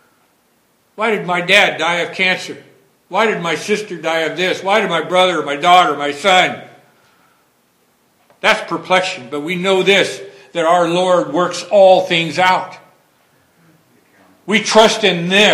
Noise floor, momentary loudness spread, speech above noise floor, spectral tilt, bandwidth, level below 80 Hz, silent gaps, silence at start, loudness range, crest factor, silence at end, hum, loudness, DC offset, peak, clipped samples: -58 dBFS; 10 LU; 44 dB; -3.5 dB/octave; 17 kHz; -62 dBFS; none; 1 s; 4 LU; 16 dB; 0 s; none; -14 LUFS; under 0.1%; 0 dBFS; 0.2%